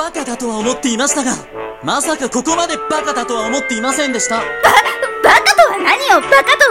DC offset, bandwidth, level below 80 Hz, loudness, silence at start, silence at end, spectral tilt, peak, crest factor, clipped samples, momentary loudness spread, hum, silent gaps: under 0.1%; 17 kHz; -46 dBFS; -13 LUFS; 0 s; 0 s; -1.5 dB/octave; 0 dBFS; 14 dB; 0.3%; 10 LU; none; none